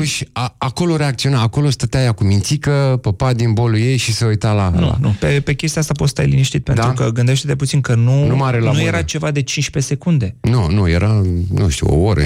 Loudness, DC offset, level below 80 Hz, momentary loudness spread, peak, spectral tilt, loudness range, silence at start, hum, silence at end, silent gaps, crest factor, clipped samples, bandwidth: -16 LUFS; under 0.1%; -32 dBFS; 4 LU; -2 dBFS; -5.5 dB/octave; 1 LU; 0 s; none; 0 s; none; 12 dB; under 0.1%; 15 kHz